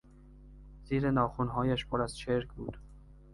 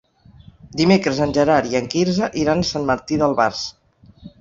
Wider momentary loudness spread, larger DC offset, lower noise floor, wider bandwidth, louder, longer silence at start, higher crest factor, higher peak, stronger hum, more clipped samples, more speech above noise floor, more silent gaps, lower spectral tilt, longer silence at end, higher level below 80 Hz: first, 14 LU vs 6 LU; neither; first, -54 dBFS vs -47 dBFS; first, 11.5 kHz vs 7.6 kHz; second, -33 LUFS vs -18 LUFS; second, 0.15 s vs 0.65 s; about the same, 20 dB vs 18 dB; second, -14 dBFS vs -2 dBFS; neither; neither; second, 22 dB vs 29 dB; neither; first, -7 dB/octave vs -5.5 dB/octave; about the same, 0 s vs 0.1 s; about the same, -50 dBFS vs -46 dBFS